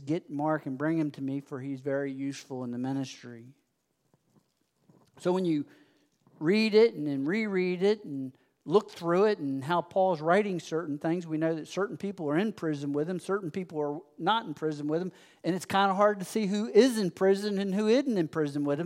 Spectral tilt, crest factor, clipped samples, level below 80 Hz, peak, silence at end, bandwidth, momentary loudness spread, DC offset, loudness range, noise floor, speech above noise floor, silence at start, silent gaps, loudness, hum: -6 dB/octave; 20 dB; under 0.1%; -82 dBFS; -8 dBFS; 0 s; 16 kHz; 11 LU; under 0.1%; 10 LU; -76 dBFS; 48 dB; 0 s; none; -29 LUFS; none